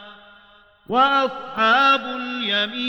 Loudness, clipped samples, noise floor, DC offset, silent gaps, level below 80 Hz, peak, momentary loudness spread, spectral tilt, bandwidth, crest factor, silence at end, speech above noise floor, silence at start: -19 LUFS; under 0.1%; -52 dBFS; under 0.1%; none; -64 dBFS; -6 dBFS; 10 LU; -3.5 dB/octave; 16.5 kHz; 16 dB; 0 s; 32 dB; 0 s